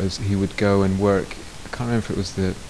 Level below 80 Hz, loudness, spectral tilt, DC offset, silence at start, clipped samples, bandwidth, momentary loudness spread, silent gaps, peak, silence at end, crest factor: -40 dBFS; -22 LUFS; -6.5 dB/octave; 0.8%; 0 s; under 0.1%; 11 kHz; 14 LU; none; -6 dBFS; 0 s; 16 dB